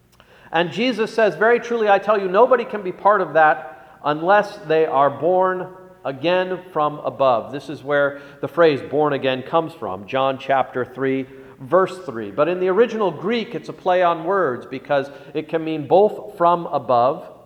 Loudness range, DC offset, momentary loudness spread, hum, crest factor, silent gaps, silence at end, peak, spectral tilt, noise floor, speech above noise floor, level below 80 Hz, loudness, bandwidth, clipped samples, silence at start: 4 LU; under 0.1%; 12 LU; none; 18 dB; none; 0.15 s; -2 dBFS; -6.5 dB/octave; -49 dBFS; 30 dB; -64 dBFS; -19 LUFS; 10.5 kHz; under 0.1%; 0.5 s